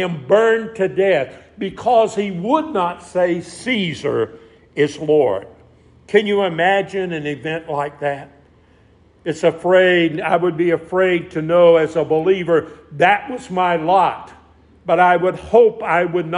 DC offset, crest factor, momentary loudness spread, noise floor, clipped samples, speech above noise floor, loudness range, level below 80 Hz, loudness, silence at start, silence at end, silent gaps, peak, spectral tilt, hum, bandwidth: under 0.1%; 16 dB; 11 LU; -51 dBFS; under 0.1%; 35 dB; 5 LU; -56 dBFS; -17 LUFS; 0 s; 0 s; none; 0 dBFS; -6 dB/octave; none; 10.5 kHz